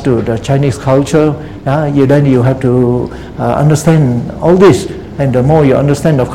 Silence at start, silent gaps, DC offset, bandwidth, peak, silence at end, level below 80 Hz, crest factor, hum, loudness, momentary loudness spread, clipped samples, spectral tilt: 0 s; none; 0.8%; 14 kHz; 0 dBFS; 0 s; -32 dBFS; 10 dB; none; -10 LUFS; 8 LU; 0.7%; -7.5 dB/octave